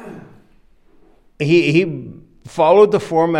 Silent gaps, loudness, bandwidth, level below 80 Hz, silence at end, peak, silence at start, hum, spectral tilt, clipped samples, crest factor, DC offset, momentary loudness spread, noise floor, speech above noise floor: none; -15 LUFS; 11 kHz; -54 dBFS; 0 s; 0 dBFS; 0 s; none; -7 dB/octave; under 0.1%; 16 dB; under 0.1%; 21 LU; -51 dBFS; 37 dB